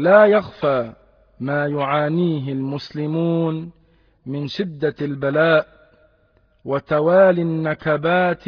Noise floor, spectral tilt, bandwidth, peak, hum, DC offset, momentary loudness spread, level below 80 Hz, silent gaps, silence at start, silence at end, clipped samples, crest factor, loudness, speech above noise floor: -59 dBFS; -8.5 dB/octave; 5.4 kHz; -2 dBFS; none; under 0.1%; 16 LU; -58 dBFS; none; 0 s; 0.1 s; under 0.1%; 18 dB; -19 LUFS; 41 dB